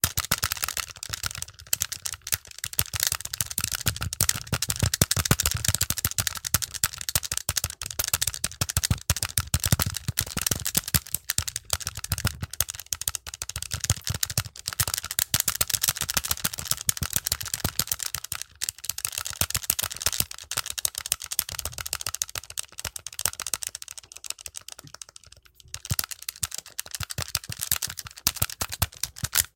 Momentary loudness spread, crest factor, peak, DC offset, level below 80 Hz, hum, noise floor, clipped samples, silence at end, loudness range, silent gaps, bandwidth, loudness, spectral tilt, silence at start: 10 LU; 30 dB; 0 dBFS; under 0.1%; -44 dBFS; none; -53 dBFS; under 0.1%; 0.1 s; 7 LU; none; 17.5 kHz; -27 LUFS; -1.5 dB/octave; 0.05 s